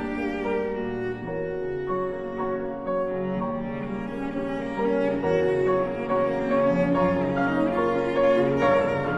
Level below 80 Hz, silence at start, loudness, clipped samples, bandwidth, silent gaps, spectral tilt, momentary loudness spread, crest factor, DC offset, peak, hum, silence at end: -48 dBFS; 0 s; -25 LUFS; under 0.1%; 8 kHz; none; -8 dB/octave; 9 LU; 14 dB; under 0.1%; -10 dBFS; none; 0 s